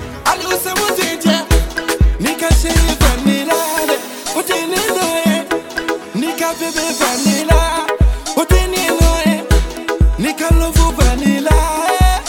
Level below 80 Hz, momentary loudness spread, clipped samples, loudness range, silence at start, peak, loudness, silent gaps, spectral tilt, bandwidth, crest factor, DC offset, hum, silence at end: -18 dBFS; 5 LU; under 0.1%; 2 LU; 0 s; 0 dBFS; -15 LUFS; none; -4.5 dB/octave; 18.5 kHz; 14 dB; under 0.1%; none; 0 s